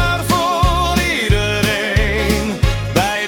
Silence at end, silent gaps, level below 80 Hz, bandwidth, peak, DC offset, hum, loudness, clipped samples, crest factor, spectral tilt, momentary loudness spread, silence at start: 0 s; none; -22 dBFS; 18 kHz; 0 dBFS; under 0.1%; none; -16 LUFS; under 0.1%; 14 dB; -4.5 dB/octave; 2 LU; 0 s